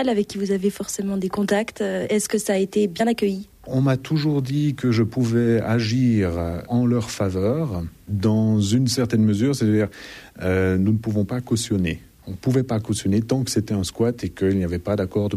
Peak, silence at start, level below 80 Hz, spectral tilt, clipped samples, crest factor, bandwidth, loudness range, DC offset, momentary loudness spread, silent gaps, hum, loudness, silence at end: -8 dBFS; 0 s; -48 dBFS; -6 dB/octave; under 0.1%; 14 dB; 15 kHz; 2 LU; under 0.1%; 6 LU; none; none; -22 LUFS; 0 s